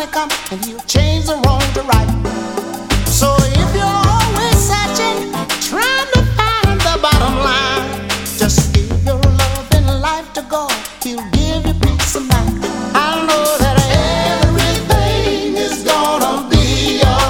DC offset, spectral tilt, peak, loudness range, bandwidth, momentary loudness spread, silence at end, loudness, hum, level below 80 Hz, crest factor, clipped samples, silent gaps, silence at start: under 0.1%; -4.5 dB/octave; 0 dBFS; 2 LU; 18 kHz; 7 LU; 0 s; -14 LUFS; none; -22 dBFS; 14 dB; under 0.1%; none; 0 s